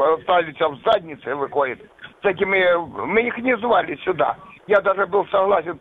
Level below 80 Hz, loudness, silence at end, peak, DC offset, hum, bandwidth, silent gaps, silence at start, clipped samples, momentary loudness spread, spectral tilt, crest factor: -56 dBFS; -20 LUFS; 0.05 s; -4 dBFS; under 0.1%; none; 4.8 kHz; none; 0 s; under 0.1%; 7 LU; -7 dB/octave; 16 dB